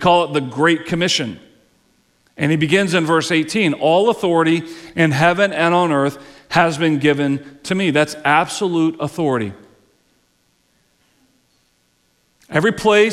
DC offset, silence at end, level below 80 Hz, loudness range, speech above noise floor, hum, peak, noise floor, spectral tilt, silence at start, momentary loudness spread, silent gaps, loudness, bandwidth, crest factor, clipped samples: under 0.1%; 0 s; -54 dBFS; 9 LU; 46 dB; none; -2 dBFS; -62 dBFS; -5 dB/octave; 0 s; 7 LU; none; -17 LUFS; 14 kHz; 16 dB; under 0.1%